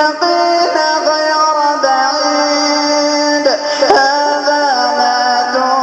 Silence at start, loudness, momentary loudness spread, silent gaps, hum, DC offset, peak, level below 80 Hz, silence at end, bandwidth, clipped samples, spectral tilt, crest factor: 0 s; -12 LUFS; 2 LU; none; none; under 0.1%; 0 dBFS; -58 dBFS; 0 s; 9.6 kHz; under 0.1%; -1 dB/octave; 12 dB